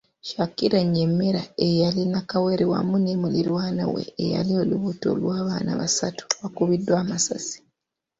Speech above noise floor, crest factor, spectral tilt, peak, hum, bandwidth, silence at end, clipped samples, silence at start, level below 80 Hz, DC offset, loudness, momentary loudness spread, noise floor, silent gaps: 57 dB; 20 dB; -5.5 dB/octave; -4 dBFS; none; 8 kHz; 0.65 s; under 0.1%; 0.25 s; -58 dBFS; under 0.1%; -23 LUFS; 6 LU; -79 dBFS; none